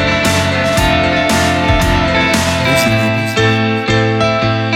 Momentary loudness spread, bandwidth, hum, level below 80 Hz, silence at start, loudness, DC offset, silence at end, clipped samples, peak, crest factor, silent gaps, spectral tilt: 2 LU; 19 kHz; none; -26 dBFS; 0 s; -12 LUFS; under 0.1%; 0 s; under 0.1%; 0 dBFS; 12 dB; none; -4.5 dB/octave